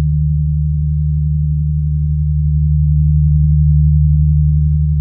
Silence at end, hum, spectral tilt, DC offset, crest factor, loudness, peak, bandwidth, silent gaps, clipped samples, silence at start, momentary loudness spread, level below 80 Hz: 0 s; none; -30.5 dB/octave; under 0.1%; 10 dB; -14 LUFS; -2 dBFS; 0.3 kHz; none; under 0.1%; 0 s; 5 LU; -16 dBFS